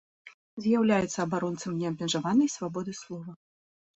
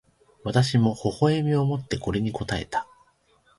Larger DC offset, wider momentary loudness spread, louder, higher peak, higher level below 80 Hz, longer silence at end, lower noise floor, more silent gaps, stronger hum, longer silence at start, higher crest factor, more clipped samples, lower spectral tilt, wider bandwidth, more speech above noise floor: neither; first, 16 LU vs 9 LU; second, -28 LUFS vs -25 LUFS; second, -14 dBFS vs -8 dBFS; second, -66 dBFS vs -48 dBFS; about the same, 0.65 s vs 0.75 s; first, under -90 dBFS vs -63 dBFS; first, 0.34-0.57 s vs none; neither; second, 0.25 s vs 0.45 s; about the same, 16 dB vs 18 dB; neither; second, -5 dB/octave vs -6.5 dB/octave; second, 8.2 kHz vs 11.5 kHz; first, over 62 dB vs 39 dB